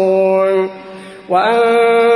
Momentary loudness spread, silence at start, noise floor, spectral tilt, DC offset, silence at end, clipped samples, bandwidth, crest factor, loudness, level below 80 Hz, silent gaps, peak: 21 LU; 0 s; -33 dBFS; -5.5 dB/octave; under 0.1%; 0 s; under 0.1%; 10.5 kHz; 12 dB; -13 LUFS; -62 dBFS; none; 0 dBFS